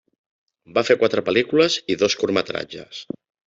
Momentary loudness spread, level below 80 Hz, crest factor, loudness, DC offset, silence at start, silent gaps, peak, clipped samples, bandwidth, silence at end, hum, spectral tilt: 16 LU; -62 dBFS; 20 dB; -20 LUFS; under 0.1%; 0.7 s; none; -2 dBFS; under 0.1%; 7.8 kHz; 0.45 s; none; -4 dB/octave